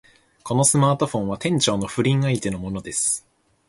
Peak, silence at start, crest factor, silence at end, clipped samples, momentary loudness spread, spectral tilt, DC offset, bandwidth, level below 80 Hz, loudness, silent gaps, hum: -6 dBFS; 0.45 s; 18 dB; 0.5 s; under 0.1%; 10 LU; -4.5 dB/octave; under 0.1%; 11.5 kHz; -50 dBFS; -21 LUFS; none; none